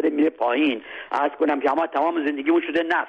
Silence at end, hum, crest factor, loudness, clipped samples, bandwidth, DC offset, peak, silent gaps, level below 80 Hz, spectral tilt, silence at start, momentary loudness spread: 0 s; none; 12 dB; -22 LUFS; under 0.1%; 6.2 kHz; under 0.1%; -10 dBFS; none; -68 dBFS; -5.5 dB/octave; 0 s; 4 LU